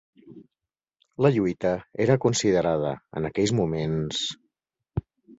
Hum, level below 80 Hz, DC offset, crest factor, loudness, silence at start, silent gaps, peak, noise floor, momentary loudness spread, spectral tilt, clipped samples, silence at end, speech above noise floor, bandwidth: none; -52 dBFS; under 0.1%; 20 dB; -25 LUFS; 0.25 s; none; -6 dBFS; -88 dBFS; 13 LU; -5.5 dB/octave; under 0.1%; 0.05 s; 64 dB; 8 kHz